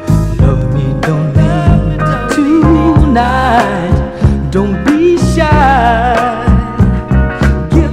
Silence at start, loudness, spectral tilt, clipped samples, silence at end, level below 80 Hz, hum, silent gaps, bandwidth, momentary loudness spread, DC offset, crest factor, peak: 0 s; -10 LUFS; -7.5 dB/octave; 0.5%; 0 s; -16 dBFS; none; none; 12.5 kHz; 5 LU; under 0.1%; 10 dB; 0 dBFS